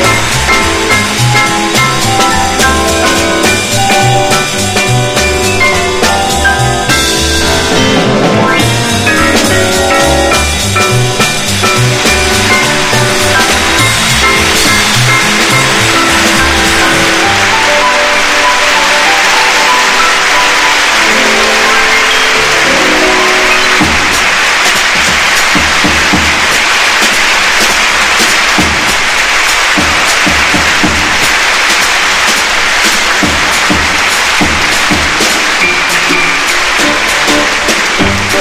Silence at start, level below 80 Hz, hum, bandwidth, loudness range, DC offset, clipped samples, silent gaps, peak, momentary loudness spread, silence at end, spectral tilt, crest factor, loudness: 0 s; -26 dBFS; none; over 20 kHz; 2 LU; under 0.1%; 0.9%; none; 0 dBFS; 3 LU; 0 s; -2.5 dB/octave; 8 dB; -7 LUFS